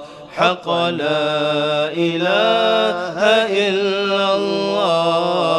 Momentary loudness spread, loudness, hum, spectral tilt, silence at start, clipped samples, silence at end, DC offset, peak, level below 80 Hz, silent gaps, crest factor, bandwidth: 4 LU; -17 LUFS; none; -5 dB/octave; 0 s; under 0.1%; 0 s; under 0.1%; -2 dBFS; -64 dBFS; none; 16 dB; 12 kHz